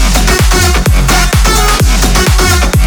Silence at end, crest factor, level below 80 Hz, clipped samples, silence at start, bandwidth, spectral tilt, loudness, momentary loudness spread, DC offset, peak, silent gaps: 0 s; 8 dB; -10 dBFS; under 0.1%; 0 s; over 20 kHz; -3.5 dB/octave; -9 LUFS; 1 LU; under 0.1%; 0 dBFS; none